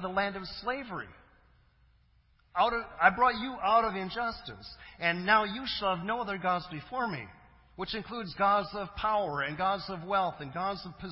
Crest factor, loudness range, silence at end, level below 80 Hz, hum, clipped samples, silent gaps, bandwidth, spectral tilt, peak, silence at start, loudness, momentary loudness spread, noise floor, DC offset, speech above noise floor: 26 dB; 4 LU; 0 s; -58 dBFS; none; under 0.1%; none; 5.8 kHz; -8.5 dB/octave; -6 dBFS; 0 s; -31 LUFS; 14 LU; -66 dBFS; under 0.1%; 35 dB